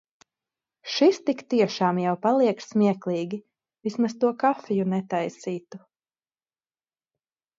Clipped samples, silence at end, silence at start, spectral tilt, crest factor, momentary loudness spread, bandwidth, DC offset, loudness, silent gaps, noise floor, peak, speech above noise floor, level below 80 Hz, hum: under 0.1%; 1.8 s; 0.85 s; -6 dB/octave; 18 dB; 13 LU; 7.8 kHz; under 0.1%; -25 LUFS; none; under -90 dBFS; -8 dBFS; over 66 dB; -76 dBFS; none